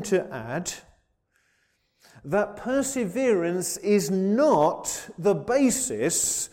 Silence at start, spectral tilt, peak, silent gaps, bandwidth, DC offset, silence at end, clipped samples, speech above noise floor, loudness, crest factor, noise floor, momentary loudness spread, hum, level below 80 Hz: 0 s; -4 dB/octave; -10 dBFS; none; 16.5 kHz; under 0.1%; 0.05 s; under 0.1%; 45 dB; -24 LUFS; 16 dB; -70 dBFS; 10 LU; none; -58 dBFS